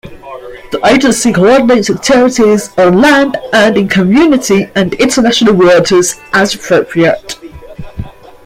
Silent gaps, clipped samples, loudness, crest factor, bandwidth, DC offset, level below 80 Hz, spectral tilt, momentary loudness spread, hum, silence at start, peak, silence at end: none; under 0.1%; -8 LUFS; 10 dB; 16.5 kHz; under 0.1%; -38 dBFS; -4.5 dB/octave; 19 LU; none; 0.05 s; 0 dBFS; 0.35 s